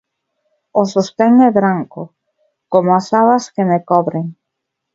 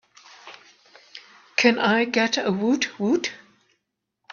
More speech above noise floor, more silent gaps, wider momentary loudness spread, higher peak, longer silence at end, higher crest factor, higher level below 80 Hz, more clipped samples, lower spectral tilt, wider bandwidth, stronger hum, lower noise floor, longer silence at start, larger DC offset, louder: first, 63 dB vs 56 dB; neither; second, 16 LU vs 25 LU; about the same, 0 dBFS vs -2 dBFS; second, 0.6 s vs 0.95 s; second, 16 dB vs 24 dB; first, -62 dBFS vs -72 dBFS; neither; first, -7 dB/octave vs -4 dB/octave; about the same, 7.8 kHz vs 7.2 kHz; neither; about the same, -77 dBFS vs -78 dBFS; first, 0.75 s vs 0.45 s; neither; first, -14 LUFS vs -22 LUFS